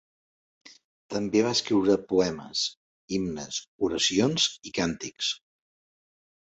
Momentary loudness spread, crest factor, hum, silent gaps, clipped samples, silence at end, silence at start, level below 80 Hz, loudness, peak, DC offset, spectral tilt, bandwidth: 10 LU; 20 dB; none; 2.77-3.08 s, 3.68-3.79 s; under 0.1%; 1.15 s; 1.1 s; -60 dBFS; -27 LUFS; -10 dBFS; under 0.1%; -3.5 dB/octave; 8.2 kHz